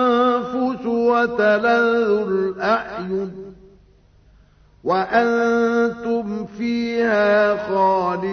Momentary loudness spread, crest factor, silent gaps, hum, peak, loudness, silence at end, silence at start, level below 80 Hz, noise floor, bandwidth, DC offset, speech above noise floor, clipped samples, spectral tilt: 9 LU; 16 dB; none; none; -4 dBFS; -19 LUFS; 0 s; 0 s; -54 dBFS; -52 dBFS; 6.6 kHz; under 0.1%; 33 dB; under 0.1%; -6.5 dB/octave